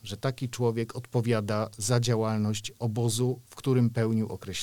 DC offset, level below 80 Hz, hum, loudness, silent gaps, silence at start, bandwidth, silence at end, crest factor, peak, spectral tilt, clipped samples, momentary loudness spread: 0.2%; -60 dBFS; none; -29 LUFS; none; 0.05 s; 17.5 kHz; 0 s; 18 dB; -10 dBFS; -5.5 dB/octave; under 0.1%; 7 LU